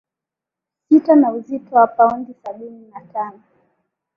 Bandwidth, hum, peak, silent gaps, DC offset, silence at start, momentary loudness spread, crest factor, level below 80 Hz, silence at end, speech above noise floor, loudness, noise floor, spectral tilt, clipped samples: 5.2 kHz; none; -2 dBFS; none; under 0.1%; 0.9 s; 20 LU; 16 dB; -64 dBFS; 0.85 s; 69 dB; -16 LUFS; -86 dBFS; -9 dB/octave; under 0.1%